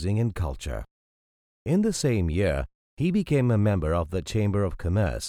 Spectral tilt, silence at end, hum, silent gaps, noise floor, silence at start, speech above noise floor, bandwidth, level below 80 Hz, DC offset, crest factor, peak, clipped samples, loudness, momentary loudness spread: -6.5 dB/octave; 0 s; none; 0.91-1.66 s, 2.75-2.97 s; under -90 dBFS; 0 s; over 65 dB; 14.5 kHz; -38 dBFS; under 0.1%; 14 dB; -10 dBFS; under 0.1%; -26 LUFS; 11 LU